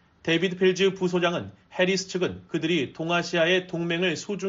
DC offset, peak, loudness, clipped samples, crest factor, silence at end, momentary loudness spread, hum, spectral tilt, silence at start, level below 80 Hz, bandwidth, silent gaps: under 0.1%; -10 dBFS; -25 LUFS; under 0.1%; 16 dB; 0 s; 7 LU; none; -3.5 dB/octave; 0.25 s; -64 dBFS; 7.8 kHz; none